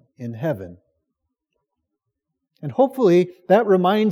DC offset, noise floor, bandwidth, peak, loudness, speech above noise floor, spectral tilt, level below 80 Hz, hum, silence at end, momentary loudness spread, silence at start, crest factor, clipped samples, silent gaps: under 0.1%; -79 dBFS; 15 kHz; -4 dBFS; -19 LUFS; 61 dB; -8 dB/octave; -74 dBFS; none; 0 s; 18 LU; 0.2 s; 18 dB; under 0.1%; none